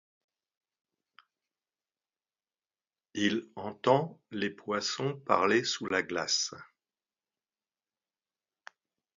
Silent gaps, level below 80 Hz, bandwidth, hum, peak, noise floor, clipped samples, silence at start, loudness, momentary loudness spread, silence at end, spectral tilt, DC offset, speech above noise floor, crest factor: none; -74 dBFS; 7.8 kHz; none; -10 dBFS; under -90 dBFS; under 0.1%; 3.15 s; -30 LUFS; 10 LU; 2.55 s; -3.5 dB/octave; under 0.1%; over 59 dB; 26 dB